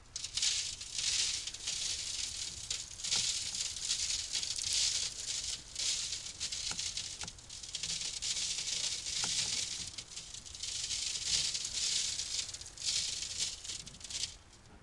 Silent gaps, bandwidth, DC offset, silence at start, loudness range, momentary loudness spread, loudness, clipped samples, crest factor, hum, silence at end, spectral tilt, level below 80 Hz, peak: none; 12 kHz; under 0.1%; 0 s; 3 LU; 10 LU; -34 LUFS; under 0.1%; 24 dB; none; 0 s; 1.5 dB/octave; -60 dBFS; -14 dBFS